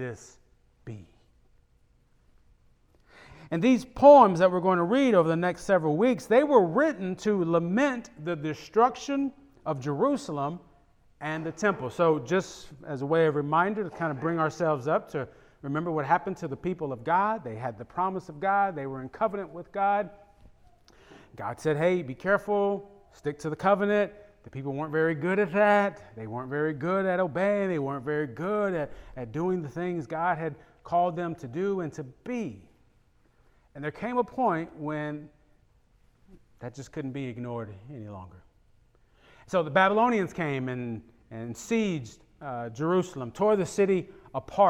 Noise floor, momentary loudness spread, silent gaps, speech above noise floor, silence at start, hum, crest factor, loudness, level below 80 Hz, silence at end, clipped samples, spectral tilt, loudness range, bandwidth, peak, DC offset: -64 dBFS; 16 LU; none; 37 dB; 0 s; none; 24 dB; -27 LUFS; -62 dBFS; 0 s; under 0.1%; -6.5 dB/octave; 11 LU; 12.5 kHz; -4 dBFS; under 0.1%